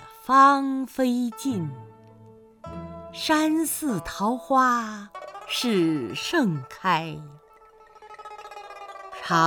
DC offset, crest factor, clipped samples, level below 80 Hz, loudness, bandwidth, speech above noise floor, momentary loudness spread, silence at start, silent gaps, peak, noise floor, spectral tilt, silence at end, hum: under 0.1%; 20 dB; under 0.1%; -58 dBFS; -23 LUFS; over 20 kHz; 29 dB; 20 LU; 0 s; none; -6 dBFS; -53 dBFS; -4.5 dB/octave; 0 s; none